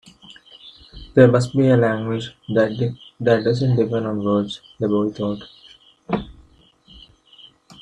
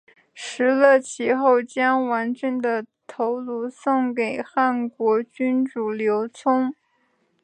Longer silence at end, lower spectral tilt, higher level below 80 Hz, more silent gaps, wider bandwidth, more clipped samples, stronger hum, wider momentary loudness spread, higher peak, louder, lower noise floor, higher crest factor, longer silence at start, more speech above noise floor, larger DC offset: second, 0.1 s vs 0.7 s; first, -7.5 dB/octave vs -4.5 dB/octave; first, -50 dBFS vs -78 dBFS; neither; about the same, 10 kHz vs 9.4 kHz; neither; neither; first, 13 LU vs 10 LU; first, 0 dBFS vs -4 dBFS; about the same, -20 LUFS vs -22 LUFS; second, -53 dBFS vs -67 dBFS; about the same, 20 dB vs 18 dB; about the same, 0.3 s vs 0.35 s; second, 35 dB vs 46 dB; neither